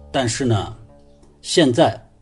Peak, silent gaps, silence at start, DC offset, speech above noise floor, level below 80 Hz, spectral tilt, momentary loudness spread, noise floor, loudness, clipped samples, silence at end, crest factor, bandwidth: -2 dBFS; none; 0 s; under 0.1%; 31 dB; -44 dBFS; -5 dB/octave; 14 LU; -48 dBFS; -18 LUFS; under 0.1%; 0.2 s; 18 dB; 11.5 kHz